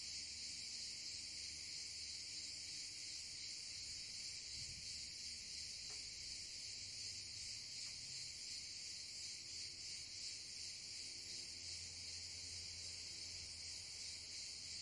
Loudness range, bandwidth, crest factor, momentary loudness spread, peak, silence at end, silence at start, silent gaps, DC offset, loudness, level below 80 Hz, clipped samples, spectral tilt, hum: 1 LU; 12 kHz; 14 dB; 1 LU; -36 dBFS; 0 s; 0 s; none; under 0.1%; -48 LUFS; -74 dBFS; under 0.1%; 0.5 dB/octave; none